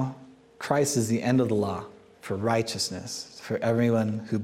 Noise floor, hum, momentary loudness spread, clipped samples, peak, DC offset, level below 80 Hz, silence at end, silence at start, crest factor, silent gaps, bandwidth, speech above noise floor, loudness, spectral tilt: -48 dBFS; none; 13 LU; under 0.1%; -10 dBFS; under 0.1%; -66 dBFS; 0 s; 0 s; 18 dB; none; 16 kHz; 22 dB; -27 LUFS; -5 dB/octave